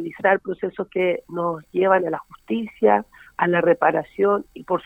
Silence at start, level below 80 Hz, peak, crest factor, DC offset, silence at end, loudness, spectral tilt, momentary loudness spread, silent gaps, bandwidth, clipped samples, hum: 0 s; -60 dBFS; -4 dBFS; 18 dB; under 0.1%; 0.05 s; -21 LUFS; -8 dB/octave; 10 LU; none; 8.4 kHz; under 0.1%; none